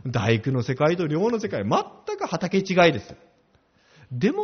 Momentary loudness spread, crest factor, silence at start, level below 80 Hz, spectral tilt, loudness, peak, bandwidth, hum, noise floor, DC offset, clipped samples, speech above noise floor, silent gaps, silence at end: 12 LU; 20 dB; 0.05 s; -58 dBFS; -5 dB/octave; -23 LUFS; -4 dBFS; 6.6 kHz; none; -62 dBFS; under 0.1%; under 0.1%; 39 dB; none; 0 s